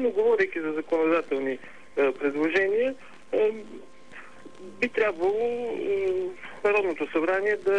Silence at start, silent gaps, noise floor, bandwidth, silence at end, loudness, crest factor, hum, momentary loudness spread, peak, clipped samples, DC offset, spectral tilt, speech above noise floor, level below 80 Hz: 0 s; none; -48 dBFS; 10 kHz; 0 s; -26 LUFS; 14 dB; none; 21 LU; -12 dBFS; under 0.1%; 0.5%; -5.5 dB/octave; 22 dB; -68 dBFS